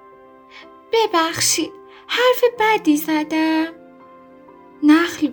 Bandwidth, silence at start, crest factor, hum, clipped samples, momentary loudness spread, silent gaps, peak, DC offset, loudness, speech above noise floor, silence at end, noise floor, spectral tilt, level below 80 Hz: over 20 kHz; 0.55 s; 18 dB; none; under 0.1%; 7 LU; none; -2 dBFS; under 0.1%; -17 LUFS; 28 dB; 0 s; -45 dBFS; -2.5 dB/octave; -64 dBFS